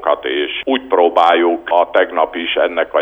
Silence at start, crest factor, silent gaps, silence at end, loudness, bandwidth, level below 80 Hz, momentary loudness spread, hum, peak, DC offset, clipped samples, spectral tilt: 0 s; 14 dB; none; 0 s; -15 LUFS; 7.6 kHz; -54 dBFS; 7 LU; none; 0 dBFS; under 0.1%; under 0.1%; -4.5 dB/octave